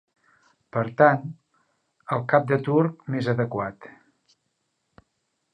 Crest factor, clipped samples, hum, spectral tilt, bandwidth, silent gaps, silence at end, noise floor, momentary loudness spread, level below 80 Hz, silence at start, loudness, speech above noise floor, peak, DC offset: 22 dB; under 0.1%; none; -9 dB/octave; 9.4 kHz; none; 1.65 s; -76 dBFS; 13 LU; -66 dBFS; 0.75 s; -23 LUFS; 53 dB; -4 dBFS; under 0.1%